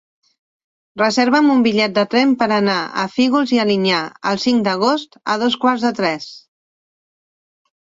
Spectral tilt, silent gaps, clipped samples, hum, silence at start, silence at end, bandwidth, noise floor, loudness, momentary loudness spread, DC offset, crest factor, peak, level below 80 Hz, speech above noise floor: -5 dB/octave; none; under 0.1%; none; 0.95 s; 1.55 s; 7.8 kHz; under -90 dBFS; -16 LUFS; 8 LU; under 0.1%; 16 dB; -2 dBFS; -62 dBFS; over 74 dB